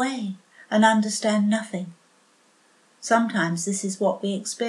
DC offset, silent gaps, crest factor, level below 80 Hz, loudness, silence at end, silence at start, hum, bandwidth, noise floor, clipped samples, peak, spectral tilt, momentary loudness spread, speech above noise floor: under 0.1%; none; 20 dB; -82 dBFS; -23 LUFS; 0 s; 0 s; none; 12.5 kHz; -60 dBFS; under 0.1%; -4 dBFS; -4.5 dB/octave; 15 LU; 37 dB